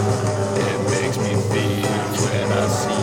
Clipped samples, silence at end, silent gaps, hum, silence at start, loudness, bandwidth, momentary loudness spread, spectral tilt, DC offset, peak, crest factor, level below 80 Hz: under 0.1%; 0 s; none; none; 0 s; -21 LUFS; 17 kHz; 1 LU; -5 dB/octave; under 0.1%; -6 dBFS; 14 dB; -48 dBFS